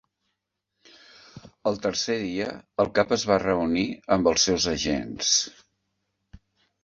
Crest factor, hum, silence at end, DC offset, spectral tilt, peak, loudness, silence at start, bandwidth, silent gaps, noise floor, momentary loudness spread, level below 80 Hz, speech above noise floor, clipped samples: 22 dB; none; 1.35 s; under 0.1%; -3 dB/octave; -6 dBFS; -24 LUFS; 1.35 s; 7.8 kHz; none; -81 dBFS; 9 LU; -52 dBFS; 56 dB; under 0.1%